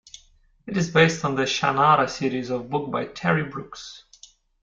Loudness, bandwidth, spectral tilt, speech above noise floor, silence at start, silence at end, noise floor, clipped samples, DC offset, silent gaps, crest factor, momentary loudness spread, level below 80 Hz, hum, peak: -22 LUFS; 7.6 kHz; -5 dB/octave; 35 dB; 0.65 s; 0.65 s; -58 dBFS; under 0.1%; under 0.1%; none; 20 dB; 16 LU; -58 dBFS; none; -4 dBFS